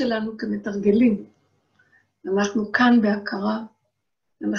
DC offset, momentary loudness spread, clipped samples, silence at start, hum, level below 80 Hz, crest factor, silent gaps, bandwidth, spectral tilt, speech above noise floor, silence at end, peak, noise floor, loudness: under 0.1%; 14 LU; under 0.1%; 0 s; none; -60 dBFS; 18 dB; none; 6.8 kHz; -6 dB/octave; 58 dB; 0 s; -6 dBFS; -79 dBFS; -22 LUFS